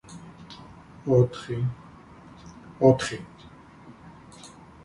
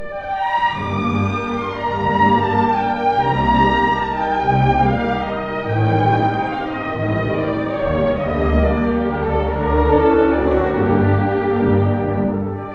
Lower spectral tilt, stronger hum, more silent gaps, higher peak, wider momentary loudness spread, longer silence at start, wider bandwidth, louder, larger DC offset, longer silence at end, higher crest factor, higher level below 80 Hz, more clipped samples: second, -7 dB/octave vs -8.5 dB/octave; neither; neither; about the same, -4 dBFS vs -2 dBFS; first, 27 LU vs 7 LU; about the same, 0.1 s vs 0 s; first, 11.5 kHz vs 7 kHz; second, -24 LUFS vs -18 LUFS; neither; first, 0.35 s vs 0 s; first, 24 dB vs 14 dB; second, -56 dBFS vs -30 dBFS; neither